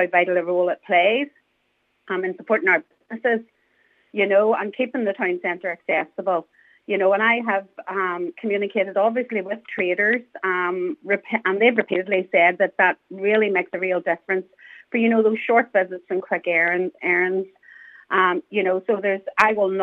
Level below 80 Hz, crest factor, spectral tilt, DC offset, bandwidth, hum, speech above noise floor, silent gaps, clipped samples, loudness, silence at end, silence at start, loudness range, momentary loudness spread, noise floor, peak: -76 dBFS; 20 dB; -6.5 dB/octave; under 0.1%; 7.8 kHz; none; 48 dB; none; under 0.1%; -21 LUFS; 0 s; 0 s; 3 LU; 8 LU; -69 dBFS; -2 dBFS